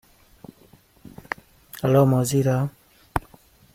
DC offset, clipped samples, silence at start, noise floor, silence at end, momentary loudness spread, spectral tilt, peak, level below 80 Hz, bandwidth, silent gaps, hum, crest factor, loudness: under 0.1%; under 0.1%; 1.75 s; -55 dBFS; 0.55 s; 17 LU; -6.5 dB/octave; -2 dBFS; -48 dBFS; 16.5 kHz; none; none; 22 dB; -23 LUFS